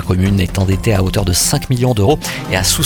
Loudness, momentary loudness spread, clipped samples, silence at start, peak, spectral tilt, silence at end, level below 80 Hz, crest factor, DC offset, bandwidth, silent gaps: -14 LUFS; 3 LU; under 0.1%; 0 s; 0 dBFS; -4.5 dB/octave; 0 s; -28 dBFS; 14 dB; under 0.1%; 19 kHz; none